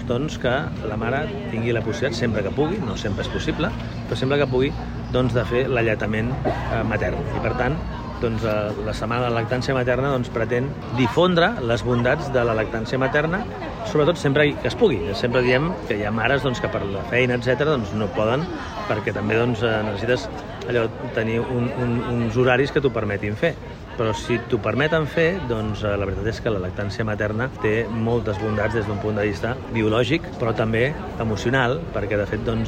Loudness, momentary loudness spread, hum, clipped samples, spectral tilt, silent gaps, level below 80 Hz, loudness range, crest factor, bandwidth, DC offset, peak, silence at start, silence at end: -22 LUFS; 6 LU; none; under 0.1%; -6.5 dB/octave; none; -38 dBFS; 3 LU; 18 dB; 9.6 kHz; under 0.1%; -4 dBFS; 0 s; 0 s